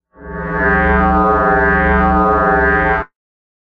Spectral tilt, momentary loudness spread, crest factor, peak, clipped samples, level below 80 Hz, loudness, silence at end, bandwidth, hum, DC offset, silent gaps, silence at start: -9.5 dB/octave; 10 LU; 12 dB; -2 dBFS; under 0.1%; -24 dBFS; -13 LUFS; 0.65 s; 5.4 kHz; none; under 0.1%; none; 0.2 s